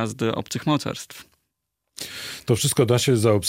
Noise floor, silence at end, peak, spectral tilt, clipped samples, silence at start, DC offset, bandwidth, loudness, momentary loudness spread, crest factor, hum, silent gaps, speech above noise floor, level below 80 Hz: -79 dBFS; 0 s; -6 dBFS; -5 dB/octave; under 0.1%; 0 s; under 0.1%; 16.5 kHz; -22 LUFS; 16 LU; 18 dB; none; none; 57 dB; -58 dBFS